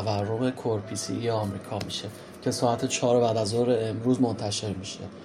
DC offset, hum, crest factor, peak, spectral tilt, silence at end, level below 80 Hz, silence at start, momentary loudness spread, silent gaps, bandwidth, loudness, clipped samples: under 0.1%; none; 16 dB; -10 dBFS; -5 dB/octave; 0 s; -64 dBFS; 0 s; 10 LU; none; 14.5 kHz; -27 LUFS; under 0.1%